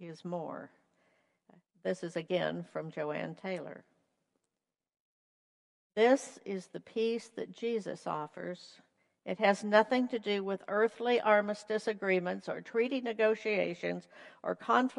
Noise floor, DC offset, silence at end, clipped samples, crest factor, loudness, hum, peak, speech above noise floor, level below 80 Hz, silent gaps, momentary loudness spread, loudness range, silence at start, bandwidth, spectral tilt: under -90 dBFS; under 0.1%; 0 s; under 0.1%; 24 dB; -33 LUFS; none; -10 dBFS; over 57 dB; -86 dBFS; 5.00-5.90 s; 14 LU; 9 LU; 0 s; 11.5 kHz; -5.5 dB/octave